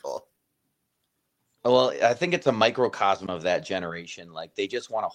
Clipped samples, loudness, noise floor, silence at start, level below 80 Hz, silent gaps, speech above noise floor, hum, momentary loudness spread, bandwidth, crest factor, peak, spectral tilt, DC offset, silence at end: under 0.1%; -25 LUFS; -77 dBFS; 0.05 s; -68 dBFS; none; 52 dB; none; 16 LU; 10 kHz; 22 dB; -6 dBFS; -4.5 dB/octave; under 0.1%; 0 s